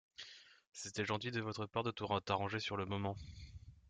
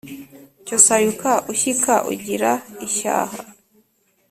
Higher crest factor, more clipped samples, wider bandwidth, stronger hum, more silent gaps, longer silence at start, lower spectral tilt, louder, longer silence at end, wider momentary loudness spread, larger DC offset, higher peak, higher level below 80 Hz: about the same, 22 dB vs 20 dB; neither; second, 9.4 kHz vs 16 kHz; neither; first, 0.67-0.72 s vs none; first, 0.2 s vs 0.05 s; first, -5 dB/octave vs -2 dB/octave; second, -41 LUFS vs -18 LUFS; second, 0 s vs 0.8 s; second, 17 LU vs 22 LU; neither; second, -20 dBFS vs 0 dBFS; about the same, -66 dBFS vs -62 dBFS